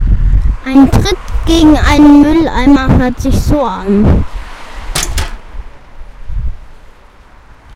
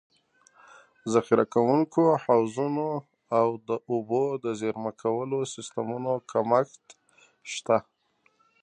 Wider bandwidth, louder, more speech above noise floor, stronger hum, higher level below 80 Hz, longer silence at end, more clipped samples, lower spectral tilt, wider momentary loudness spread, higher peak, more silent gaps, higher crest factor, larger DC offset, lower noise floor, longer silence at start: first, 16 kHz vs 10 kHz; first, -10 LUFS vs -27 LUFS; second, 31 dB vs 42 dB; neither; first, -16 dBFS vs -74 dBFS; first, 1 s vs 0.8 s; first, 1% vs under 0.1%; about the same, -6 dB/octave vs -6 dB/octave; first, 18 LU vs 11 LU; first, 0 dBFS vs -6 dBFS; neither; second, 10 dB vs 22 dB; neither; second, -38 dBFS vs -68 dBFS; second, 0 s vs 1.05 s